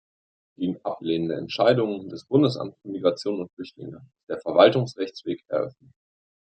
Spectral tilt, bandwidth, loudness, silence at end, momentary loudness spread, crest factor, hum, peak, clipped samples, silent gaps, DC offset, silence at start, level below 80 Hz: -7 dB/octave; 9 kHz; -24 LUFS; 0.8 s; 17 LU; 24 dB; none; -2 dBFS; under 0.1%; 3.53-3.57 s, 4.23-4.27 s; under 0.1%; 0.6 s; -70 dBFS